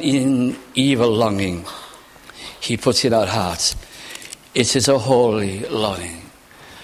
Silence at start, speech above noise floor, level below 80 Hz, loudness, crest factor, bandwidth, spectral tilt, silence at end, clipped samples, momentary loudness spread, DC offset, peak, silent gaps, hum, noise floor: 0 s; 25 dB; -44 dBFS; -18 LUFS; 18 dB; 15.5 kHz; -4 dB/octave; 0 s; under 0.1%; 18 LU; under 0.1%; 0 dBFS; none; none; -43 dBFS